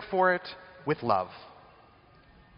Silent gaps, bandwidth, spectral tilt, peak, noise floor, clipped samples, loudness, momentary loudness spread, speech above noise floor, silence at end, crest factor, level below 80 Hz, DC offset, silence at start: none; 5.4 kHz; -3.5 dB/octave; -10 dBFS; -58 dBFS; under 0.1%; -29 LUFS; 17 LU; 30 dB; 1.1 s; 20 dB; -66 dBFS; under 0.1%; 0 s